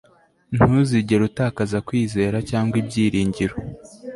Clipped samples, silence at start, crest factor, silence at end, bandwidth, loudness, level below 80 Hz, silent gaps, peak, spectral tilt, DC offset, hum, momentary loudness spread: under 0.1%; 0.5 s; 18 dB; 0 s; 11.5 kHz; -21 LUFS; -44 dBFS; none; -2 dBFS; -7 dB/octave; under 0.1%; none; 10 LU